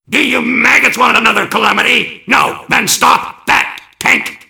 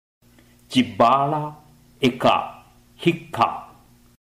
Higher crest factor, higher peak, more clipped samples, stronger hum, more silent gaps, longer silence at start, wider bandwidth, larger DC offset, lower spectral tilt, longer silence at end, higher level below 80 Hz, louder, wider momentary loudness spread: second, 12 dB vs 18 dB; first, 0 dBFS vs -6 dBFS; first, 1% vs under 0.1%; second, none vs 60 Hz at -45 dBFS; neither; second, 0.1 s vs 0.7 s; first, over 20 kHz vs 16 kHz; first, 0.1% vs under 0.1%; second, -1.5 dB/octave vs -6 dB/octave; second, 0.1 s vs 0.75 s; first, -48 dBFS vs -58 dBFS; first, -10 LUFS vs -21 LUFS; second, 5 LU vs 12 LU